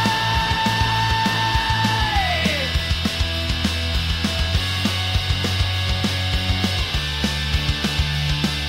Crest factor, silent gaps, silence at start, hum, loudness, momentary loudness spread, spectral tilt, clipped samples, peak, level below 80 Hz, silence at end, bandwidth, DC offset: 16 dB; none; 0 s; none; -20 LUFS; 3 LU; -4 dB/octave; under 0.1%; -6 dBFS; -28 dBFS; 0 s; 16 kHz; under 0.1%